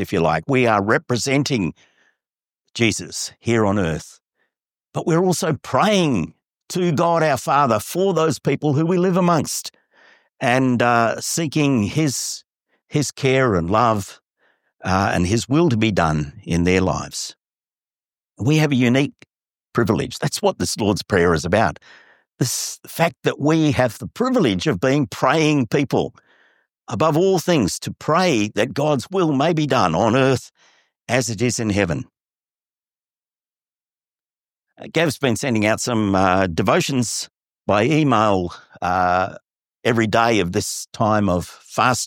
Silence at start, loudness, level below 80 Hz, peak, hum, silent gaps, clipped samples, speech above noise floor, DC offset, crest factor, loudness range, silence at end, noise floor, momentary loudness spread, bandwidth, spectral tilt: 0 s; -19 LUFS; -48 dBFS; -2 dBFS; none; none; under 0.1%; over 71 dB; under 0.1%; 18 dB; 4 LU; 0 s; under -90 dBFS; 9 LU; 17 kHz; -5 dB/octave